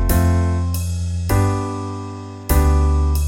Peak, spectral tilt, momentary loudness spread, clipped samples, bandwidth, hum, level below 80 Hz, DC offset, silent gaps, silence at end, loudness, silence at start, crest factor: -2 dBFS; -6.5 dB/octave; 12 LU; under 0.1%; 17 kHz; none; -22 dBFS; under 0.1%; none; 0 s; -19 LUFS; 0 s; 16 dB